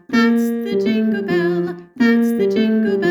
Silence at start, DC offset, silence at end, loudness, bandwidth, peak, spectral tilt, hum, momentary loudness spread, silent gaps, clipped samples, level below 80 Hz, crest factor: 0.1 s; under 0.1%; 0 s; -17 LUFS; 19 kHz; -4 dBFS; -6.5 dB/octave; none; 5 LU; none; under 0.1%; -60 dBFS; 14 dB